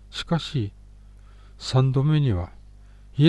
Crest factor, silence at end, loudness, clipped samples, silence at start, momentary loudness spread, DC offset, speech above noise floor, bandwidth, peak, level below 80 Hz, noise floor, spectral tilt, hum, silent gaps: 18 dB; 0 s; -24 LUFS; under 0.1%; 0.15 s; 15 LU; under 0.1%; 24 dB; 10 kHz; -6 dBFS; -44 dBFS; -47 dBFS; -7 dB/octave; 50 Hz at -40 dBFS; none